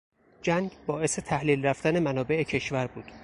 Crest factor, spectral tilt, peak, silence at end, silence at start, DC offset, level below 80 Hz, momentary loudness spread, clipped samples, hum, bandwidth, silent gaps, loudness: 18 dB; -5 dB/octave; -10 dBFS; 0 s; 0.45 s; under 0.1%; -56 dBFS; 7 LU; under 0.1%; none; 11.5 kHz; none; -28 LUFS